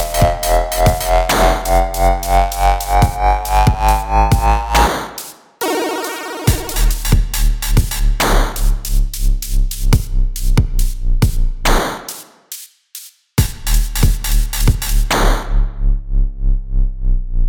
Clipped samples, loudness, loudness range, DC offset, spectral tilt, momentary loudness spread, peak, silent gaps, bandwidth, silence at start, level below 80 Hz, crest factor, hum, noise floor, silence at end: under 0.1%; -17 LUFS; 5 LU; under 0.1%; -4.5 dB/octave; 9 LU; 0 dBFS; none; 19.5 kHz; 0 s; -16 dBFS; 14 dB; none; -37 dBFS; 0 s